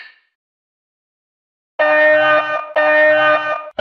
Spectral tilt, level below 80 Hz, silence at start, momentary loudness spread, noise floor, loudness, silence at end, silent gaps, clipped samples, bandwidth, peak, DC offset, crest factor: -4.5 dB/octave; -70 dBFS; 0 s; 8 LU; under -90 dBFS; -13 LUFS; 0.1 s; 0.35-1.79 s; under 0.1%; 6.4 kHz; -4 dBFS; under 0.1%; 12 dB